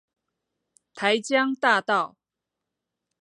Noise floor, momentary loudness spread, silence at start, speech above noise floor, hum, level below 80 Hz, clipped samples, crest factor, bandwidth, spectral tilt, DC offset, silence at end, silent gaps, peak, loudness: -86 dBFS; 6 LU; 0.95 s; 63 dB; none; -82 dBFS; under 0.1%; 22 dB; 11 kHz; -3 dB/octave; under 0.1%; 1.15 s; none; -6 dBFS; -23 LUFS